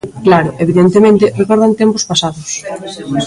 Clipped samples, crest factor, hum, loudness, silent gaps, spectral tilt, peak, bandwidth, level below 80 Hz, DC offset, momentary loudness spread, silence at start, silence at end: under 0.1%; 12 dB; none; -11 LUFS; none; -5 dB/octave; 0 dBFS; 11.5 kHz; -46 dBFS; under 0.1%; 13 LU; 0.05 s; 0 s